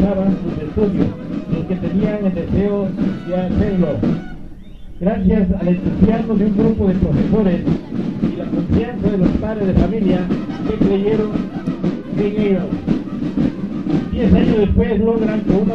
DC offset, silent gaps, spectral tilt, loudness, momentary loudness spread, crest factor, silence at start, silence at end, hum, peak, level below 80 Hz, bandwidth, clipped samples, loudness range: 0.9%; none; -10 dB/octave; -18 LUFS; 6 LU; 16 dB; 0 s; 0 s; none; 0 dBFS; -30 dBFS; 6 kHz; under 0.1%; 3 LU